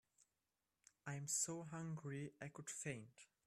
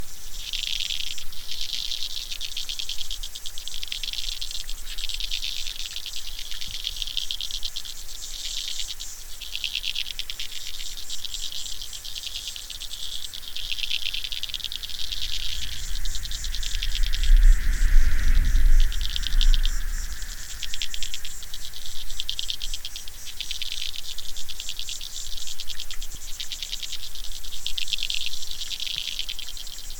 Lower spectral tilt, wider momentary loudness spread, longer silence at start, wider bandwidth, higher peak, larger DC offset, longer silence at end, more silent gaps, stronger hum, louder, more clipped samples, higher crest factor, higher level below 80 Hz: first, -3.5 dB/octave vs -0.5 dB/octave; first, 13 LU vs 9 LU; first, 1.05 s vs 0 s; second, 14.5 kHz vs 19 kHz; second, -30 dBFS vs -4 dBFS; neither; first, 0.2 s vs 0 s; neither; neither; second, -47 LUFS vs -30 LUFS; neither; about the same, 20 dB vs 20 dB; second, -84 dBFS vs -26 dBFS